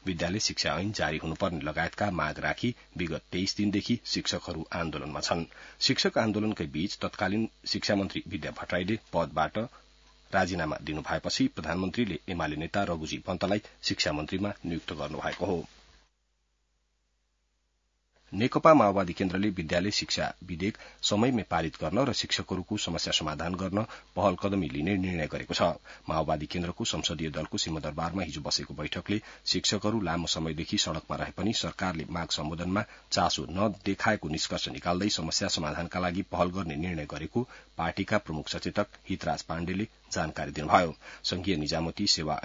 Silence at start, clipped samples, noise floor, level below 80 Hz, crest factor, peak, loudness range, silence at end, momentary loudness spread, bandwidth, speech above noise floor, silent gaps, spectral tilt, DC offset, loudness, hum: 0.05 s; under 0.1%; -75 dBFS; -54 dBFS; 24 dB; -6 dBFS; 5 LU; 0 s; 8 LU; 7.8 kHz; 45 dB; none; -4 dB/octave; under 0.1%; -30 LUFS; none